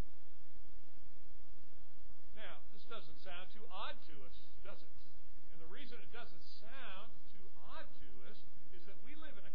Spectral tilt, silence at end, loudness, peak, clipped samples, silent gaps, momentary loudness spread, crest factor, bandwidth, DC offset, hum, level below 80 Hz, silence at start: -6.5 dB/octave; 0 s; -56 LUFS; -24 dBFS; under 0.1%; none; 15 LU; 20 dB; 5.4 kHz; 4%; none; -66 dBFS; 0 s